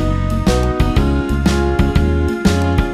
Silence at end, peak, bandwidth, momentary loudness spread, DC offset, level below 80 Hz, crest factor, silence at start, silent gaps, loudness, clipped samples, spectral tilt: 0 s; 0 dBFS; 14 kHz; 2 LU; under 0.1%; -18 dBFS; 14 dB; 0 s; none; -16 LUFS; under 0.1%; -6.5 dB/octave